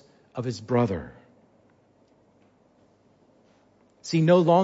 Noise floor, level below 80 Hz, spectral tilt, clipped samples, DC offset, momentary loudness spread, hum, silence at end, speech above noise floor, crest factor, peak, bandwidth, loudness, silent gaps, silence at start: -61 dBFS; -60 dBFS; -7 dB/octave; under 0.1%; under 0.1%; 22 LU; none; 0 s; 40 dB; 20 dB; -8 dBFS; 8 kHz; -24 LUFS; none; 0.35 s